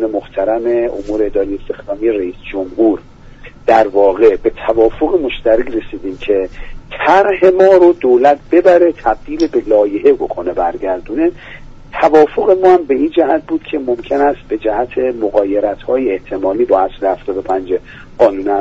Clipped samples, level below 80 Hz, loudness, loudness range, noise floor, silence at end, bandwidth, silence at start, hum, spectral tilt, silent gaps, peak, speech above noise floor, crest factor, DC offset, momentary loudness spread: under 0.1%; -36 dBFS; -13 LUFS; 5 LU; -35 dBFS; 0 s; 7.6 kHz; 0 s; none; -6.5 dB/octave; none; 0 dBFS; 23 dB; 12 dB; under 0.1%; 11 LU